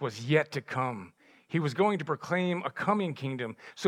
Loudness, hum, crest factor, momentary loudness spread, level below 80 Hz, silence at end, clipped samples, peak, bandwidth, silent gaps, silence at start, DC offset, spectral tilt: -31 LUFS; none; 20 dB; 8 LU; -82 dBFS; 0 s; under 0.1%; -10 dBFS; 14 kHz; none; 0 s; under 0.1%; -6.5 dB/octave